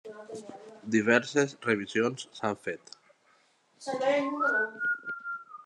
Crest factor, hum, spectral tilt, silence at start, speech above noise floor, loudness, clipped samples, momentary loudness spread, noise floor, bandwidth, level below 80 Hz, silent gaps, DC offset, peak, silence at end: 24 dB; none; -4.5 dB/octave; 0.05 s; 38 dB; -29 LUFS; under 0.1%; 19 LU; -66 dBFS; 11 kHz; -82 dBFS; none; under 0.1%; -8 dBFS; 0.05 s